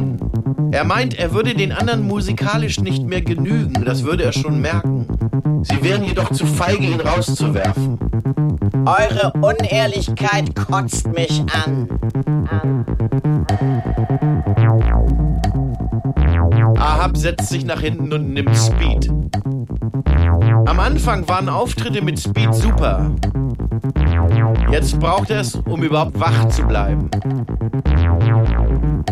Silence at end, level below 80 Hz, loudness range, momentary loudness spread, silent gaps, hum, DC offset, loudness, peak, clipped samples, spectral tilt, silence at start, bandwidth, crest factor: 0 s; -22 dBFS; 2 LU; 6 LU; none; none; under 0.1%; -17 LUFS; -4 dBFS; under 0.1%; -6.5 dB/octave; 0 s; 13.5 kHz; 12 dB